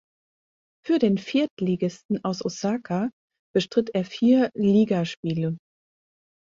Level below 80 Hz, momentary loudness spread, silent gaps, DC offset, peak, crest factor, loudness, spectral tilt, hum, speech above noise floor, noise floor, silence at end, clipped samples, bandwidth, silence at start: -64 dBFS; 9 LU; 1.51-1.57 s, 2.05-2.09 s, 3.13-3.28 s, 3.39-3.54 s, 5.17-5.23 s; under 0.1%; -8 dBFS; 16 dB; -24 LUFS; -6.5 dB/octave; none; over 67 dB; under -90 dBFS; 0.9 s; under 0.1%; 7.6 kHz; 0.85 s